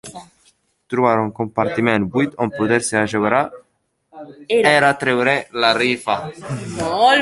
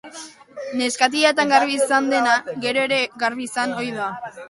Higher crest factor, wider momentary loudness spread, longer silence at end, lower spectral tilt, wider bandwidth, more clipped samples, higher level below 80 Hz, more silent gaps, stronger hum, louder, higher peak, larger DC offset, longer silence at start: about the same, 18 dB vs 20 dB; about the same, 12 LU vs 12 LU; about the same, 0 s vs 0 s; first, -4.5 dB/octave vs -2.5 dB/octave; about the same, 11.5 kHz vs 11.5 kHz; neither; first, -54 dBFS vs -68 dBFS; neither; neither; about the same, -18 LUFS vs -20 LUFS; about the same, -2 dBFS vs -2 dBFS; neither; about the same, 0.05 s vs 0.05 s